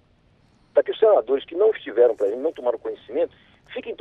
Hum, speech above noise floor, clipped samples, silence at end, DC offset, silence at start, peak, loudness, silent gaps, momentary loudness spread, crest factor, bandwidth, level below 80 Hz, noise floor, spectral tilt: none; 37 dB; under 0.1%; 0.05 s; under 0.1%; 0.75 s; -6 dBFS; -22 LUFS; none; 12 LU; 18 dB; 4 kHz; -66 dBFS; -59 dBFS; -6 dB/octave